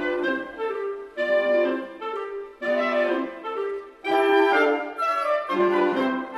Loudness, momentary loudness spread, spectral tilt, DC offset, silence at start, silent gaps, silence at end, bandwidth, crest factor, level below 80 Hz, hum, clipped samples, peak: -24 LUFS; 12 LU; -5 dB/octave; under 0.1%; 0 s; none; 0 s; 12.5 kHz; 16 dB; -66 dBFS; none; under 0.1%; -8 dBFS